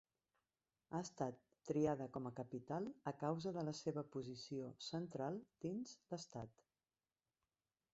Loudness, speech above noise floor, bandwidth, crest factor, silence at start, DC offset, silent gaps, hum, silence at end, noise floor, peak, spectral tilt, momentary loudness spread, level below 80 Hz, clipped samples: -47 LUFS; over 44 dB; 8 kHz; 20 dB; 0.9 s; under 0.1%; none; none; 1.45 s; under -90 dBFS; -26 dBFS; -6.5 dB/octave; 10 LU; -80 dBFS; under 0.1%